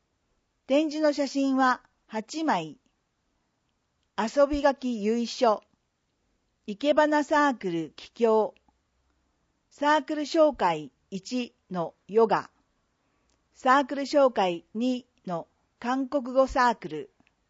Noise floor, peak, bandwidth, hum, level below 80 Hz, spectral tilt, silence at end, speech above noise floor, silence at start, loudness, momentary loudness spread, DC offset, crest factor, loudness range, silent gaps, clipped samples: -75 dBFS; -8 dBFS; 8 kHz; none; -58 dBFS; -5 dB/octave; 0.45 s; 50 dB; 0.7 s; -26 LUFS; 13 LU; under 0.1%; 20 dB; 3 LU; none; under 0.1%